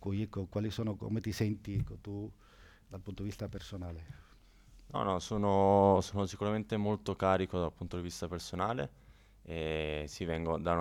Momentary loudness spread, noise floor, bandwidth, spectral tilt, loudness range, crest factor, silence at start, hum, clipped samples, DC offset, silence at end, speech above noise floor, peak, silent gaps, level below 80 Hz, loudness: 15 LU; -59 dBFS; 16.5 kHz; -6.5 dB/octave; 11 LU; 20 dB; 0 s; none; under 0.1%; under 0.1%; 0 s; 25 dB; -14 dBFS; none; -56 dBFS; -35 LUFS